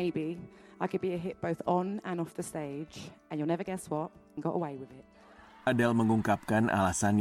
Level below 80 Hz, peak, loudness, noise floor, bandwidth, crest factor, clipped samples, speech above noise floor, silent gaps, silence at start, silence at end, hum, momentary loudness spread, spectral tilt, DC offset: -62 dBFS; -14 dBFS; -32 LUFS; -55 dBFS; 16.5 kHz; 18 dB; under 0.1%; 24 dB; none; 0 s; 0 s; none; 14 LU; -6 dB/octave; under 0.1%